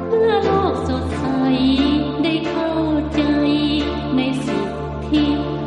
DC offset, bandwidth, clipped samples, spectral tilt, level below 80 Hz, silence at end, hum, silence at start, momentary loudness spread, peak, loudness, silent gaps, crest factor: under 0.1%; 11 kHz; under 0.1%; -7 dB/octave; -36 dBFS; 0 s; none; 0 s; 6 LU; -4 dBFS; -19 LUFS; none; 14 dB